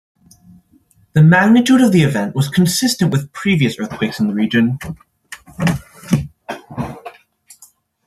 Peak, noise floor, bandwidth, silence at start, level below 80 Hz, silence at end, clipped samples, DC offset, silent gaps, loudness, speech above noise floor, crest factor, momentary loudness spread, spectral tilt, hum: 0 dBFS; -54 dBFS; 13.5 kHz; 1.15 s; -48 dBFS; 0.95 s; under 0.1%; under 0.1%; none; -15 LUFS; 40 dB; 16 dB; 20 LU; -5.5 dB/octave; none